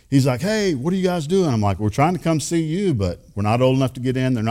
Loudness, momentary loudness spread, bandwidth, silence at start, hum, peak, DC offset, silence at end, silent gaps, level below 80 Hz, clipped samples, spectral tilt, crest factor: -20 LUFS; 4 LU; 16 kHz; 0.1 s; none; -4 dBFS; under 0.1%; 0 s; none; -48 dBFS; under 0.1%; -6.5 dB/octave; 16 dB